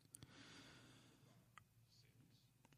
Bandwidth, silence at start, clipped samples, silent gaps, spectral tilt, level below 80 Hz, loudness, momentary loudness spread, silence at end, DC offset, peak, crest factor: 15 kHz; 0 s; under 0.1%; none; -3 dB/octave; -86 dBFS; -64 LUFS; 7 LU; 0 s; under 0.1%; -34 dBFS; 32 dB